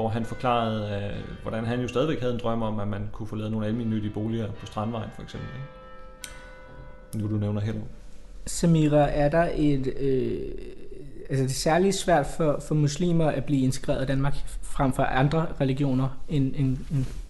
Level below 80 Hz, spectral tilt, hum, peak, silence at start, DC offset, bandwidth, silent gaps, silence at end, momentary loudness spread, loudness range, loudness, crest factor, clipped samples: -40 dBFS; -6.5 dB/octave; none; -10 dBFS; 0 s; under 0.1%; 12.5 kHz; none; 0 s; 19 LU; 9 LU; -26 LUFS; 16 dB; under 0.1%